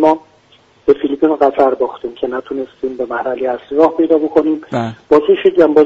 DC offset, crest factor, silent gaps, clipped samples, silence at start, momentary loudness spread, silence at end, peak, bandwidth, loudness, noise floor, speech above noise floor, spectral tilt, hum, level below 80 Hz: under 0.1%; 14 dB; none; under 0.1%; 0 s; 11 LU; 0 s; 0 dBFS; 7.6 kHz; -15 LUFS; -49 dBFS; 36 dB; -7.5 dB/octave; none; -52 dBFS